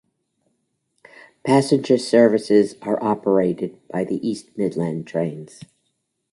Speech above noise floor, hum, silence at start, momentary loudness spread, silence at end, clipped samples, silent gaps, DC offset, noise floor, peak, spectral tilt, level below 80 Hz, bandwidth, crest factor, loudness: 53 dB; none; 1.45 s; 12 LU; 0.7 s; under 0.1%; none; under 0.1%; -73 dBFS; -2 dBFS; -6.5 dB/octave; -64 dBFS; 11.5 kHz; 18 dB; -20 LUFS